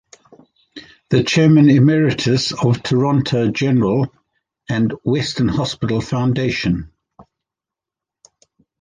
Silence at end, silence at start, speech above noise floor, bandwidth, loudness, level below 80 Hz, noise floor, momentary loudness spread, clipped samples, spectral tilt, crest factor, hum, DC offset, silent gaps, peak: 1.6 s; 0.75 s; 71 dB; 9.6 kHz; -16 LUFS; -46 dBFS; -87 dBFS; 9 LU; under 0.1%; -6.5 dB/octave; 16 dB; none; under 0.1%; none; -2 dBFS